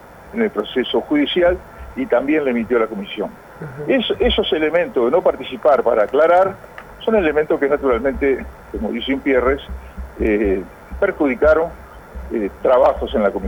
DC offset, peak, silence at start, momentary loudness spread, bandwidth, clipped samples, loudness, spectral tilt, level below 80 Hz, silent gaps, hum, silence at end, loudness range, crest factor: under 0.1%; -4 dBFS; 0.1 s; 14 LU; 19.5 kHz; under 0.1%; -18 LUFS; -7 dB/octave; -36 dBFS; none; none; 0 s; 3 LU; 14 dB